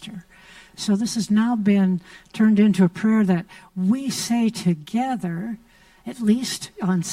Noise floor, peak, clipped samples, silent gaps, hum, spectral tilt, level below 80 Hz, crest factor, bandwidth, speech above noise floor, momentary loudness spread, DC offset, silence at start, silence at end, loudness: -48 dBFS; -6 dBFS; under 0.1%; none; none; -6 dB/octave; -60 dBFS; 16 dB; 15 kHz; 27 dB; 17 LU; under 0.1%; 0 s; 0 s; -21 LUFS